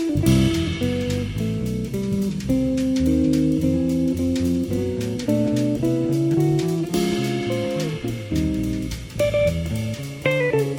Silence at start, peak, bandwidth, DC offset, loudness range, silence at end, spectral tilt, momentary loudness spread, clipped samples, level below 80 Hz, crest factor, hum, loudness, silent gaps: 0 s; -6 dBFS; 19 kHz; under 0.1%; 2 LU; 0 s; -6.5 dB/octave; 7 LU; under 0.1%; -36 dBFS; 16 dB; none; -22 LUFS; none